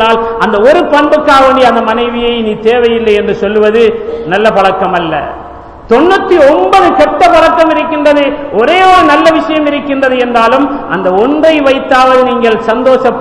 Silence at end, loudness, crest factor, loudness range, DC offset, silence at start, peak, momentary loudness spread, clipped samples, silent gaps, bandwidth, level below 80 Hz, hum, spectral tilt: 0 s; -7 LUFS; 8 dB; 3 LU; 0.4%; 0 s; 0 dBFS; 6 LU; 6%; none; 12 kHz; -36 dBFS; none; -5 dB/octave